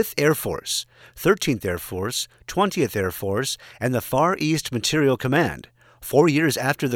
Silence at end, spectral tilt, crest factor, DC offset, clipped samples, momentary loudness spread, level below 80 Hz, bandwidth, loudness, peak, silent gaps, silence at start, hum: 0 s; -4.5 dB/octave; 20 dB; under 0.1%; under 0.1%; 8 LU; -52 dBFS; 19.5 kHz; -22 LUFS; -4 dBFS; none; 0 s; none